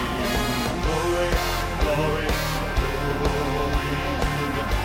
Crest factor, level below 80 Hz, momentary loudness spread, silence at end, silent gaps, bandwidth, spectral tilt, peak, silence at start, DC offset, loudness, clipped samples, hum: 16 dB; -28 dBFS; 2 LU; 0 s; none; 16 kHz; -5 dB/octave; -8 dBFS; 0 s; under 0.1%; -24 LUFS; under 0.1%; none